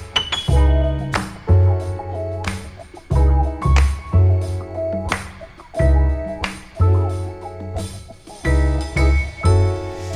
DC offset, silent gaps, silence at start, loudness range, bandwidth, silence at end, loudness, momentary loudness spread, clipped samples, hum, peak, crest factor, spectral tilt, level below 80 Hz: under 0.1%; none; 0 s; 3 LU; 11 kHz; 0 s; -19 LUFS; 14 LU; under 0.1%; none; -2 dBFS; 16 dB; -6 dB/octave; -22 dBFS